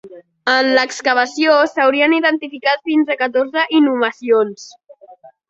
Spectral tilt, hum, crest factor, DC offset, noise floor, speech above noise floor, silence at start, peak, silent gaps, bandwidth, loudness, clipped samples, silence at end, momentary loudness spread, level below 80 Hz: -3 dB/octave; none; 16 dB; under 0.1%; -44 dBFS; 28 dB; 0.05 s; 0 dBFS; none; 8 kHz; -15 LUFS; under 0.1%; 0.35 s; 6 LU; -66 dBFS